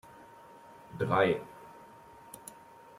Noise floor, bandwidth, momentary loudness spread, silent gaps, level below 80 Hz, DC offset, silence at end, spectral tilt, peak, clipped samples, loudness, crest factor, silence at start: -54 dBFS; 16 kHz; 26 LU; none; -70 dBFS; under 0.1%; 0.45 s; -6 dB/octave; -12 dBFS; under 0.1%; -30 LUFS; 24 dB; 0.2 s